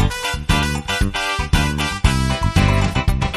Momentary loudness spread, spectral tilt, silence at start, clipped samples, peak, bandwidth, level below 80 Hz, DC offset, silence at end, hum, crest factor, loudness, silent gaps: 4 LU; -4.5 dB/octave; 0 s; under 0.1%; -2 dBFS; 13.5 kHz; -22 dBFS; under 0.1%; 0 s; none; 16 dB; -19 LUFS; none